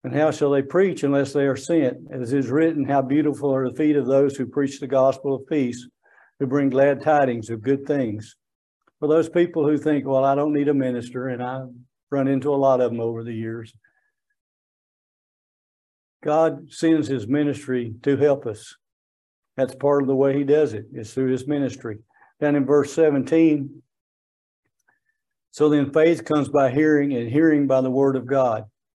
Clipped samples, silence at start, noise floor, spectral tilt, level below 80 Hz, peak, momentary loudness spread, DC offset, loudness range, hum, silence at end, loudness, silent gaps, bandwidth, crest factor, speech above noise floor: under 0.1%; 0.05 s; -76 dBFS; -7.5 dB/octave; -68 dBFS; -6 dBFS; 11 LU; under 0.1%; 5 LU; none; 0.3 s; -21 LUFS; 8.55-8.80 s, 12.03-12.07 s, 14.41-16.20 s, 18.93-19.42 s, 24.01-24.63 s; 11.5 kHz; 16 dB; 56 dB